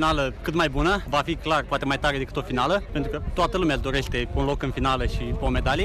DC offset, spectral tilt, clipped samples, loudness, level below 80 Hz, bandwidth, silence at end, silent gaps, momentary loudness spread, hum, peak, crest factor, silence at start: under 0.1%; -5.5 dB/octave; under 0.1%; -25 LUFS; -32 dBFS; 14 kHz; 0 s; none; 5 LU; none; -12 dBFS; 12 dB; 0 s